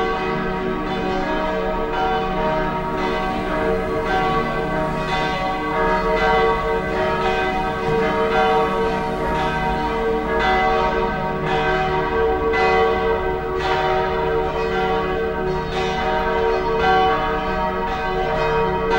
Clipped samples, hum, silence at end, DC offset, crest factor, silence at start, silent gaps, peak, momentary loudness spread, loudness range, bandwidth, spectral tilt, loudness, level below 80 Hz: under 0.1%; none; 0 s; under 0.1%; 14 dB; 0 s; none; -4 dBFS; 5 LU; 2 LU; 16 kHz; -6 dB/octave; -20 LUFS; -32 dBFS